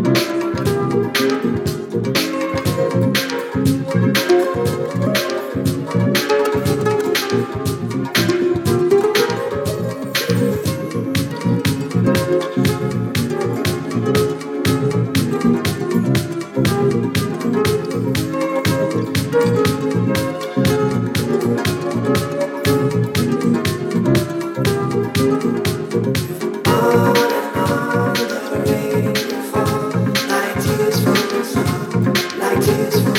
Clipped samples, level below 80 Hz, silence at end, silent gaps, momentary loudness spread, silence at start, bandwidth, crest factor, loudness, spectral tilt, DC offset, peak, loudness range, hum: under 0.1%; -44 dBFS; 0 s; none; 5 LU; 0 s; 17.5 kHz; 14 dB; -18 LUFS; -5.5 dB/octave; under 0.1%; -2 dBFS; 1 LU; none